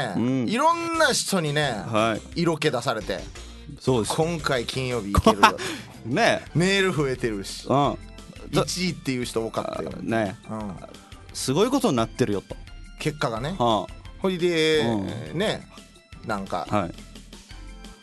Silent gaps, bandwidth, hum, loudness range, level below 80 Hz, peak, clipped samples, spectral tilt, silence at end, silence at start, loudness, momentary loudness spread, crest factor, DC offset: none; 12 kHz; none; 5 LU; -44 dBFS; -2 dBFS; under 0.1%; -4.5 dB/octave; 0.05 s; 0 s; -24 LUFS; 19 LU; 22 dB; under 0.1%